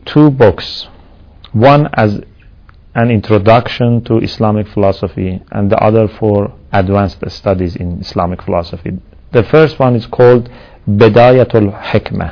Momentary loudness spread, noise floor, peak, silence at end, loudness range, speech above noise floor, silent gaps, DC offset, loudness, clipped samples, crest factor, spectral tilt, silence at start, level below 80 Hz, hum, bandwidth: 13 LU; -39 dBFS; 0 dBFS; 0 s; 4 LU; 29 dB; none; under 0.1%; -11 LUFS; 2%; 10 dB; -9 dB/octave; 0.05 s; -36 dBFS; none; 5.4 kHz